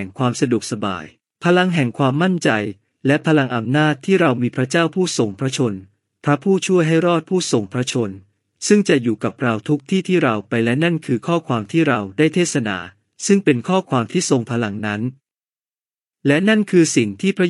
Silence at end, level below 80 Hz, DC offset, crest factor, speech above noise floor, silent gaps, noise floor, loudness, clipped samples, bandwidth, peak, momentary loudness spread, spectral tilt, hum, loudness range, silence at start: 0 s; -68 dBFS; under 0.1%; 18 dB; over 73 dB; none; under -90 dBFS; -18 LUFS; under 0.1%; 11.5 kHz; 0 dBFS; 8 LU; -5.5 dB/octave; none; 2 LU; 0 s